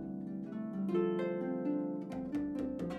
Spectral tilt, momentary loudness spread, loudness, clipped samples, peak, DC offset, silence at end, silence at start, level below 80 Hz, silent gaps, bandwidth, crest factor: -9 dB/octave; 8 LU; -37 LUFS; under 0.1%; -22 dBFS; under 0.1%; 0 s; 0 s; -64 dBFS; none; 9.2 kHz; 14 dB